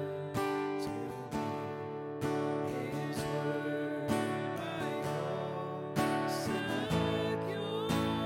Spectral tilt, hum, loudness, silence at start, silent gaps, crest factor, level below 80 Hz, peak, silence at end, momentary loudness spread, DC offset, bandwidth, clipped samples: -6 dB/octave; none; -35 LUFS; 0 s; none; 18 dB; -64 dBFS; -18 dBFS; 0 s; 6 LU; under 0.1%; 16 kHz; under 0.1%